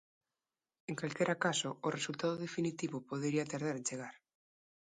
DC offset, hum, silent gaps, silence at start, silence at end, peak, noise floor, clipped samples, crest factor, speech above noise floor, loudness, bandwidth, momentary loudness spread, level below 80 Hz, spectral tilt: under 0.1%; none; none; 0.9 s; 0.65 s; -18 dBFS; under -90 dBFS; under 0.1%; 20 dB; over 53 dB; -37 LUFS; 11 kHz; 10 LU; -80 dBFS; -4 dB/octave